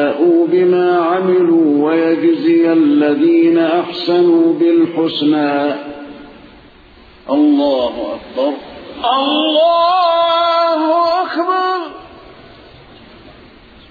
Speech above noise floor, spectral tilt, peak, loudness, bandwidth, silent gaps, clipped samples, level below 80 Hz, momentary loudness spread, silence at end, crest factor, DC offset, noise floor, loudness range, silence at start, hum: 30 dB; -7.5 dB/octave; -2 dBFS; -13 LUFS; 4.9 kHz; none; under 0.1%; -52 dBFS; 9 LU; 1.75 s; 10 dB; under 0.1%; -42 dBFS; 6 LU; 0 s; none